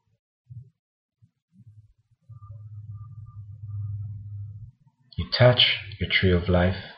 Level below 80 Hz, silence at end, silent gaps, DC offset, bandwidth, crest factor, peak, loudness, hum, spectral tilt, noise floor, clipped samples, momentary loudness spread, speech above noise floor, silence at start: -46 dBFS; 0.05 s; 0.79-1.09 s, 1.42-1.48 s; under 0.1%; 5.6 kHz; 22 dB; -6 dBFS; -22 LUFS; none; -9.5 dB/octave; -60 dBFS; under 0.1%; 24 LU; 38 dB; 0.5 s